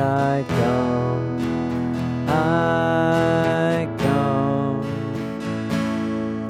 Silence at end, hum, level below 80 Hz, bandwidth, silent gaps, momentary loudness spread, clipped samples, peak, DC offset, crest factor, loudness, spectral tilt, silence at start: 0 s; none; -46 dBFS; 15.5 kHz; none; 7 LU; under 0.1%; -8 dBFS; under 0.1%; 14 dB; -21 LUFS; -7.5 dB/octave; 0 s